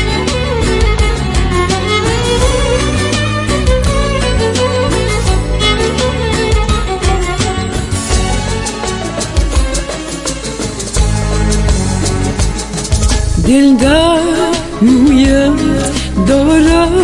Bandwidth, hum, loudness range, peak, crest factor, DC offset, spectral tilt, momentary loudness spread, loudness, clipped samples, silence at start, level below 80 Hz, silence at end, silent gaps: 11.5 kHz; none; 6 LU; 0 dBFS; 12 dB; under 0.1%; -5 dB/octave; 8 LU; -12 LUFS; under 0.1%; 0 s; -18 dBFS; 0 s; none